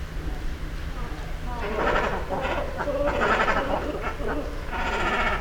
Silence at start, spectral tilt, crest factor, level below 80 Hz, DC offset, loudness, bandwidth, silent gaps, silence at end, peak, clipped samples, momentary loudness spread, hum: 0 s; -5.5 dB/octave; 18 dB; -32 dBFS; under 0.1%; -27 LUFS; 19.5 kHz; none; 0 s; -8 dBFS; under 0.1%; 13 LU; none